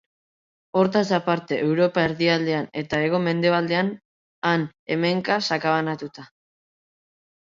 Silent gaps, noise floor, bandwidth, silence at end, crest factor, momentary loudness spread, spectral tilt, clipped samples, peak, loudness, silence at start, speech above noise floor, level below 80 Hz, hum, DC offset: 4.05-4.42 s, 4.79-4.86 s; under -90 dBFS; 7.6 kHz; 1.2 s; 18 dB; 7 LU; -6 dB/octave; under 0.1%; -6 dBFS; -23 LUFS; 0.75 s; over 68 dB; -64 dBFS; none; under 0.1%